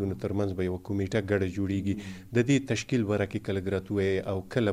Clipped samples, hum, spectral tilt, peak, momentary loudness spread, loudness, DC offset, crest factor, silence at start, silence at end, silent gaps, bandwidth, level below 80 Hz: under 0.1%; none; -6.5 dB/octave; -12 dBFS; 6 LU; -29 LUFS; under 0.1%; 18 dB; 0 s; 0 s; none; 14.5 kHz; -56 dBFS